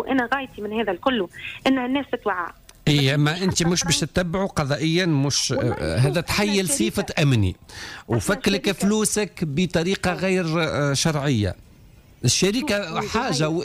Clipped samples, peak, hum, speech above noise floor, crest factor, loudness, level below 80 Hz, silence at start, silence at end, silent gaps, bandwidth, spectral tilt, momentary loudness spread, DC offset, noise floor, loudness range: under 0.1%; -8 dBFS; none; 27 dB; 14 dB; -22 LUFS; -46 dBFS; 0 s; 0 s; none; 16 kHz; -4.5 dB/octave; 6 LU; under 0.1%; -49 dBFS; 2 LU